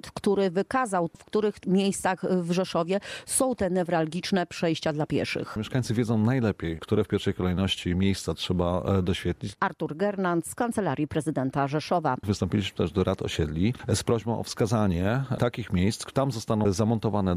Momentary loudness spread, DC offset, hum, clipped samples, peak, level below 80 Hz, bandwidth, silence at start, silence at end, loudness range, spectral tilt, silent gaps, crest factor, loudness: 4 LU; under 0.1%; none; under 0.1%; -10 dBFS; -52 dBFS; 15.5 kHz; 0.05 s; 0 s; 1 LU; -5.5 dB/octave; none; 16 dB; -27 LUFS